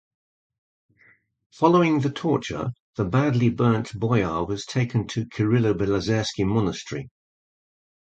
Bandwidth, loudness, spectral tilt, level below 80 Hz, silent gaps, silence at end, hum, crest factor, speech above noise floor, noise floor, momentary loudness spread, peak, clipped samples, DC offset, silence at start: 8.4 kHz; -23 LUFS; -7 dB/octave; -50 dBFS; 2.80-2.93 s; 0.95 s; none; 20 dB; 37 dB; -59 dBFS; 10 LU; -4 dBFS; under 0.1%; under 0.1%; 1.6 s